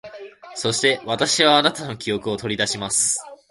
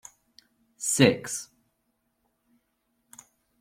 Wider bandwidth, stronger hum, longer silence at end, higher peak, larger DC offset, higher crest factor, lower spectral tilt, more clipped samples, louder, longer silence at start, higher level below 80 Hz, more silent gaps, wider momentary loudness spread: second, 12 kHz vs 16.5 kHz; neither; second, 0.15 s vs 2.15 s; first, 0 dBFS vs -6 dBFS; neither; about the same, 22 dB vs 26 dB; second, -2 dB/octave vs -4 dB/octave; neither; first, -20 LUFS vs -25 LUFS; second, 0.05 s vs 0.8 s; first, -58 dBFS vs -68 dBFS; neither; about the same, 13 LU vs 15 LU